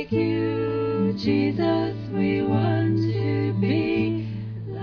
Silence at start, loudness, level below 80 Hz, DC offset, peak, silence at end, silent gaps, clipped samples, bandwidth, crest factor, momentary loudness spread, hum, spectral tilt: 0 s; -24 LUFS; -52 dBFS; under 0.1%; -10 dBFS; 0 s; none; under 0.1%; 5.4 kHz; 14 dB; 5 LU; none; -9.5 dB/octave